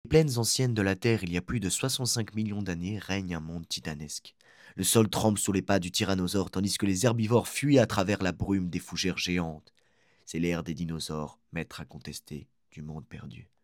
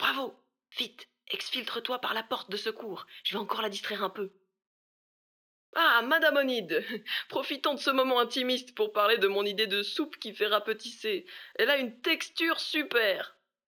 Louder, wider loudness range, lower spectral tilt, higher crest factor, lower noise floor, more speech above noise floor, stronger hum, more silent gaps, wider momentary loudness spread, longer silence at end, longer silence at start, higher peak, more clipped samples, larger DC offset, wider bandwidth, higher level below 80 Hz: about the same, -29 LUFS vs -29 LUFS; about the same, 9 LU vs 7 LU; first, -4.5 dB/octave vs -2.5 dB/octave; about the same, 22 dB vs 20 dB; second, -67 dBFS vs under -90 dBFS; second, 38 dB vs over 60 dB; neither; second, none vs 4.67-5.73 s; first, 17 LU vs 11 LU; second, 0.2 s vs 0.4 s; about the same, 0.05 s vs 0 s; about the same, -8 dBFS vs -10 dBFS; neither; neither; second, 17.5 kHz vs over 20 kHz; first, -54 dBFS vs under -90 dBFS